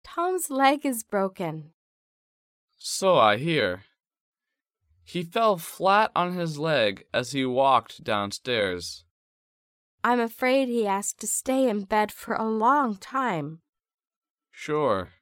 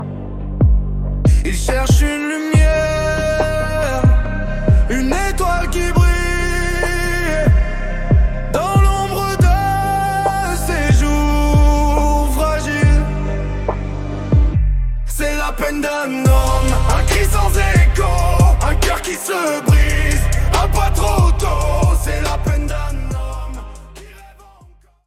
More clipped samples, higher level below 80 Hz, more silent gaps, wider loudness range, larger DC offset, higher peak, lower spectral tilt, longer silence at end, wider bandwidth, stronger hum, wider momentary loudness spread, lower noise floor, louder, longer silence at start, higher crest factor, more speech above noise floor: neither; second, -66 dBFS vs -16 dBFS; first, 1.74-2.68 s, 4.20-4.32 s, 9.11-9.98 s, 13.69-13.73 s, 13.94-13.98 s, 14.07-14.22 s, 14.30-14.35 s vs none; about the same, 3 LU vs 3 LU; neither; second, -6 dBFS vs -2 dBFS; second, -4 dB/octave vs -5.5 dB/octave; second, 0.15 s vs 0.8 s; about the same, 17 kHz vs 15.5 kHz; neither; first, 12 LU vs 8 LU; first, -87 dBFS vs -47 dBFS; second, -25 LUFS vs -16 LUFS; about the same, 0.05 s vs 0 s; first, 20 dB vs 12 dB; first, 62 dB vs 32 dB